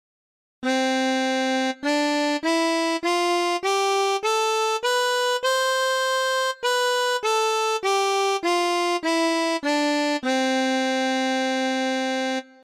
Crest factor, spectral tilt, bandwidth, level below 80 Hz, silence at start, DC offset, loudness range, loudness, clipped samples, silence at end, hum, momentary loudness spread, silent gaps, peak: 12 dB; -0.5 dB/octave; 16 kHz; -74 dBFS; 0.6 s; under 0.1%; 1 LU; -22 LUFS; under 0.1%; 0.2 s; none; 2 LU; none; -10 dBFS